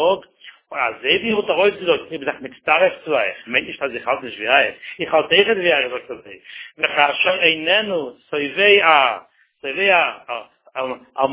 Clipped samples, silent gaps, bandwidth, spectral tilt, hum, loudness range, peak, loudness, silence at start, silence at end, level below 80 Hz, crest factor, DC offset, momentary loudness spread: under 0.1%; none; 4 kHz; -7 dB/octave; none; 3 LU; 0 dBFS; -17 LUFS; 0 s; 0 s; -62 dBFS; 20 dB; under 0.1%; 16 LU